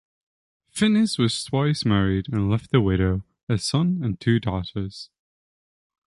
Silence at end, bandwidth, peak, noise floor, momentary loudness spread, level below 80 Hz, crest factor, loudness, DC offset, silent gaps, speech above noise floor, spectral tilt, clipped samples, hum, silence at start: 1.05 s; 11.5 kHz; -4 dBFS; under -90 dBFS; 11 LU; -42 dBFS; 18 dB; -23 LUFS; under 0.1%; 3.43-3.47 s; over 68 dB; -6 dB/octave; under 0.1%; none; 0.75 s